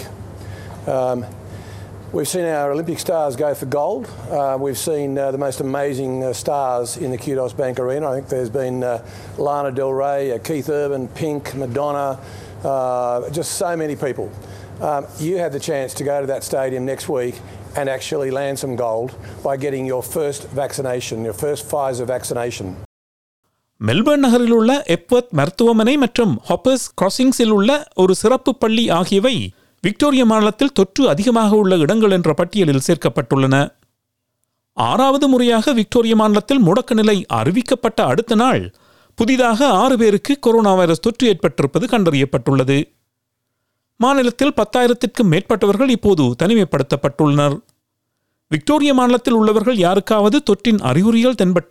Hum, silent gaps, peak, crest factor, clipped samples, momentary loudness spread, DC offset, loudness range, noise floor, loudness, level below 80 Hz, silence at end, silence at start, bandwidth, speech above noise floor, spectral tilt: none; 22.85-23.43 s; -2 dBFS; 14 dB; under 0.1%; 11 LU; under 0.1%; 8 LU; -74 dBFS; -17 LUFS; -50 dBFS; 0.1 s; 0 s; 15.5 kHz; 58 dB; -5.5 dB/octave